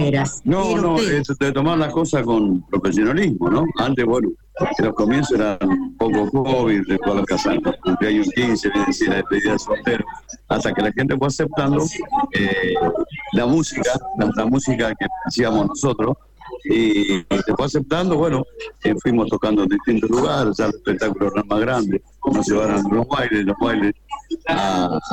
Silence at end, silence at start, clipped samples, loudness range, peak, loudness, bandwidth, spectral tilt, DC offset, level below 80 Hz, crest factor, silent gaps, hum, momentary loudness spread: 0 s; 0 s; under 0.1%; 1 LU; -8 dBFS; -19 LUFS; 9.8 kHz; -5.5 dB/octave; under 0.1%; -42 dBFS; 12 dB; none; none; 5 LU